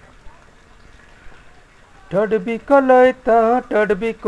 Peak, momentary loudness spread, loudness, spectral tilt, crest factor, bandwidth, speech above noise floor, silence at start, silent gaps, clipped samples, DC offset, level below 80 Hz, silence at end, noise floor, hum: -2 dBFS; 9 LU; -16 LUFS; -7 dB/octave; 16 dB; 11 kHz; 31 dB; 0.25 s; none; under 0.1%; under 0.1%; -46 dBFS; 0 s; -46 dBFS; none